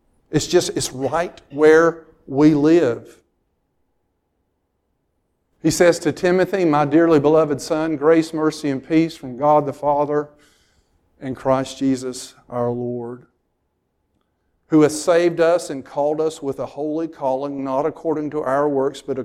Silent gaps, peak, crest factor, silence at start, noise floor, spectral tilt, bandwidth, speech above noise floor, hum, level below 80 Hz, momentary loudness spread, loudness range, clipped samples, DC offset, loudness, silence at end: none; 0 dBFS; 18 dB; 0.3 s; -70 dBFS; -5.5 dB/octave; 14.5 kHz; 52 dB; none; -54 dBFS; 12 LU; 8 LU; under 0.1%; under 0.1%; -19 LUFS; 0 s